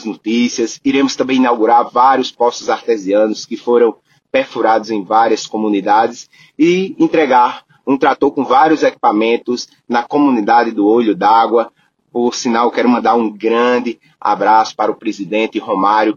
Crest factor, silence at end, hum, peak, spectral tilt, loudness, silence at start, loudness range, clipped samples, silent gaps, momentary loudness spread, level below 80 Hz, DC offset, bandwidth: 14 dB; 0.05 s; none; 0 dBFS; -4.5 dB/octave; -14 LUFS; 0 s; 2 LU; under 0.1%; none; 8 LU; -60 dBFS; under 0.1%; 7.6 kHz